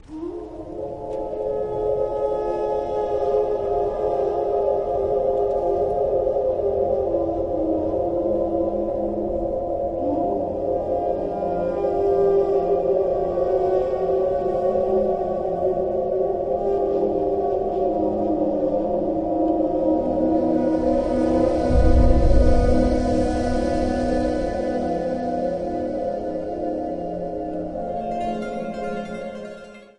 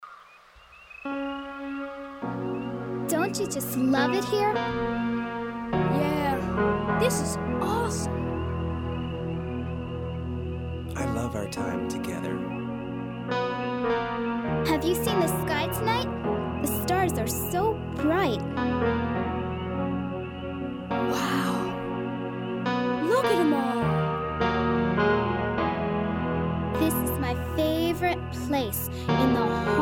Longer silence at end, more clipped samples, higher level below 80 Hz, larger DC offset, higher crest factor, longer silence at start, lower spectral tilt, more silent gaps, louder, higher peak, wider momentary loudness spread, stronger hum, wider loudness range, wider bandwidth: first, 0.15 s vs 0 s; neither; first, -30 dBFS vs -44 dBFS; neither; about the same, 16 dB vs 16 dB; about the same, 0.1 s vs 0 s; first, -8.5 dB/octave vs -5.5 dB/octave; neither; first, -22 LUFS vs -27 LUFS; first, -4 dBFS vs -10 dBFS; about the same, 9 LU vs 9 LU; neither; about the same, 6 LU vs 6 LU; second, 10 kHz vs 19 kHz